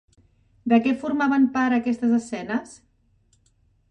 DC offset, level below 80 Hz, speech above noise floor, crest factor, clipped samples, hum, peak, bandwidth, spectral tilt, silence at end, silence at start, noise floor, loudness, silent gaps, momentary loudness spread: under 0.1%; -64 dBFS; 42 dB; 18 dB; under 0.1%; none; -6 dBFS; 9.6 kHz; -5.5 dB/octave; 1.15 s; 0.65 s; -63 dBFS; -22 LUFS; none; 9 LU